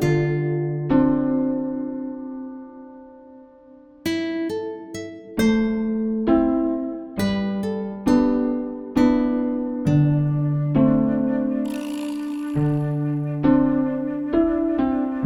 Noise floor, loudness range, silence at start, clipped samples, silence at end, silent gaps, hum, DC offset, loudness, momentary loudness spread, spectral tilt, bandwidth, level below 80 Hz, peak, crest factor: -47 dBFS; 8 LU; 0 s; under 0.1%; 0 s; none; none; under 0.1%; -22 LUFS; 12 LU; -8 dB/octave; 14 kHz; -44 dBFS; -6 dBFS; 16 dB